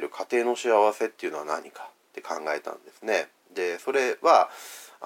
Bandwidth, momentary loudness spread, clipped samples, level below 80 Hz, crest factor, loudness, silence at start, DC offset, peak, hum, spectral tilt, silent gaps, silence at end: 17 kHz; 21 LU; under 0.1%; under -90 dBFS; 22 dB; -26 LUFS; 0 s; under 0.1%; -4 dBFS; none; -2.5 dB/octave; none; 0 s